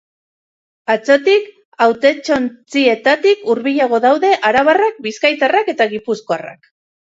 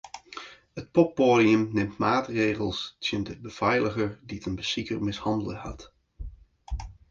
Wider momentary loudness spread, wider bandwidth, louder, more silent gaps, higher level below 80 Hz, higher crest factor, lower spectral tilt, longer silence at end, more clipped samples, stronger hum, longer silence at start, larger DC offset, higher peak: second, 9 LU vs 21 LU; about the same, 7.8 kHz vs 7.6 kHz; first, -14 LUFS vs -26 LUFS; first, 1.65-1.72 s vs none; second, -60 dBFS vs -46 dBFS; second, 14 dB vs 20 dB; second, -4 dB/octave vs -6 dB/octave; first, 0.5 s vs 0.2 s; neither; neither; first, 0.9 s vs 0.05 s; neither; first, 0 dBFS vs -8 dBFS